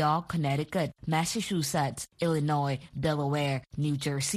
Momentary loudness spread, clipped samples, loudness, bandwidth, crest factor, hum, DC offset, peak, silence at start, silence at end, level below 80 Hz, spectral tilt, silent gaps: 4 LU; under 0.1%; -30 LUFS; 15 kHz; 16 dB; none; under 0.1%; -14 dBFS; 0 s; 0 s; -58 dBFS; -5 dB/octave; none